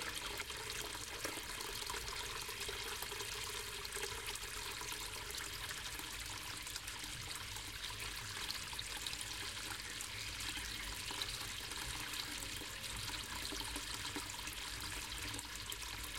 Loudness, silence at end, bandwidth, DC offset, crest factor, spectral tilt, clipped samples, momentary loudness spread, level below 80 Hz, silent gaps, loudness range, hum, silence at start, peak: -43 LUFS; 0 s; 17 kHz; under 0.1%; 22 dB; -1 dB/octave; under 0.1%; 2 LU; -56 dBFS; none; 1 LU; none; 0 s; -24 dBFS